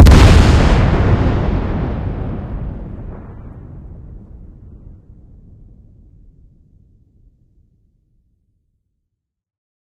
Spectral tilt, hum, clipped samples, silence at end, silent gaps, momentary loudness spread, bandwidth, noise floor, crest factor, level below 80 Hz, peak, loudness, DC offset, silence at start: -6.5 dB/octave; none; 0.3%; 5.1 s; none; 27 LU; 13 kHz; -76 dBFS; 16 dB; -20 dBFS; 0 dBFS; -14 LUFS; under 0.1%; 0 s